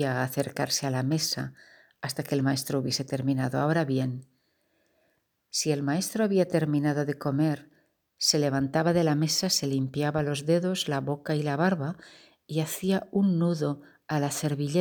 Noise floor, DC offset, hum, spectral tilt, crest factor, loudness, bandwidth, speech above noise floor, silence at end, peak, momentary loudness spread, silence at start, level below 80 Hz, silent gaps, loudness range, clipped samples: -73 dBFS; under 0.1%; none; -5 dB/octave; 18 dB; -27 LUFS; over 20 kHz; 46 dB; 0 s; -10 dBFS; 8 LU; 0 s; -66 dBFS; none; 3 LU; under 0.1%